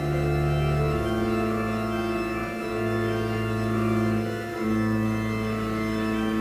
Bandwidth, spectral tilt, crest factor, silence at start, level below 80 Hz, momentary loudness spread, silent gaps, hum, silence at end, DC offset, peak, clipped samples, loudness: 16 kHz; -7 dB/octave; 12 dB; 0 s; -38 dBFS; 4 LU; none; none; 0 s; under 0.1%; -14 dBFS; under 0.1%; -26 LUFS